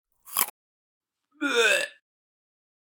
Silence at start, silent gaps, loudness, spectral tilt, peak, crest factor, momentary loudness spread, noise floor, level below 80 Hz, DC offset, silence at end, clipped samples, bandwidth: 0.25 s; 0.50-1.01 s; -25 LUFS; 0.5 dB/octave; -4 dBFS; 26 dB; 11 LU; under -90 dBFS; -88 dBFS; under 0.1%; 1.1 s; under 0.1%; over 20 kHz